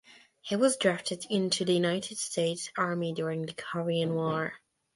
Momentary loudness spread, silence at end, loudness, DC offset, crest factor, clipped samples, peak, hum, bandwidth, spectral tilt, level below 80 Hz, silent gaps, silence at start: 8 LU; 0.4 s; -30 LUFS; under 0.1%; 20 dB; under 0.1%; -10 dBFS; none; 11.5 kHz; -4.5 dB/octave; -72 dBFS; none; 0.1 s